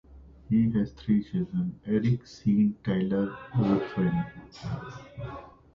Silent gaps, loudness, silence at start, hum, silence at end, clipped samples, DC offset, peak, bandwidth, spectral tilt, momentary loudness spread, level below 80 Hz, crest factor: none; -28 LUFS; 0.1 s; none; 0.25 s; under 0.1%; under 0.1%; -12 dBFS; 7 kHz; -9 dB/octave; 15 LU; -52 dBFS; 16 dB